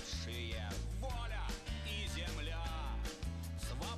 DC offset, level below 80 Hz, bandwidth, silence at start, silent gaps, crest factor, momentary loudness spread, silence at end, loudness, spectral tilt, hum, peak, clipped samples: under 0.1%; -44 dBFS; 14 kHz; 0 s; none; 12 dB; 3 LU; 0 s; -43 LUFS; -4 dB/octave; none; -30 dBFS; under 0.1%